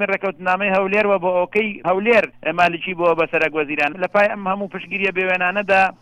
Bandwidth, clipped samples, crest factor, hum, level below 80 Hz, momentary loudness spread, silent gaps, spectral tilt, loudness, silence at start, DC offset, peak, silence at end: 11 kHz; under 0.1%; 16 dB; none; -58 dBFS; 5 LU; none; -6 dB/octave; -18 LUFS; 0 s; under 0.1%; -2 dBFS; 0.1 s